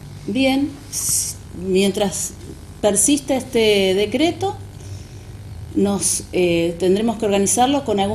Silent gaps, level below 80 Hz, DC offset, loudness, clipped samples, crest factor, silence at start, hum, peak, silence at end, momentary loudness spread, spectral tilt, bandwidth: none; -42 dBFS; under 0.1%; -18 LUFS; under 0.1%; 16 dB; 0 s; 50 Hz at -40 dBFS; -4 dBFS; 0 s; 19 LU; -3.5 dB/octave; 13.5 kHz